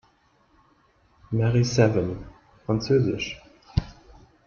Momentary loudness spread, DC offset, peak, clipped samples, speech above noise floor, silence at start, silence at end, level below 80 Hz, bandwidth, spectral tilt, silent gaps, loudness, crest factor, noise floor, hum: 18 LU; under 0.1%; -6 dBFS; under 0.1%; 40 dB; 1.3 s; 0.55 s; -44 dBFS; 7.2 kHz; -6.5 dB/octave; none; -24 LUFS; 20 dB; -62 dBFS; none